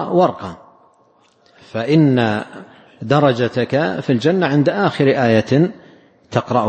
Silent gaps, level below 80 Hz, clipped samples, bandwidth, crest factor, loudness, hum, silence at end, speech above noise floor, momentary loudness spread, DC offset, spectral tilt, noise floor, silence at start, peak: none; -56 dBFS; under 0.1%; 8.8 kHz; 16 dB; -16 LUFS; none; 0 s; 39 dB; 12 LU; under 0.1%; -7.5 dB/octave; -55 dBFS; 0 s; 0 dBFS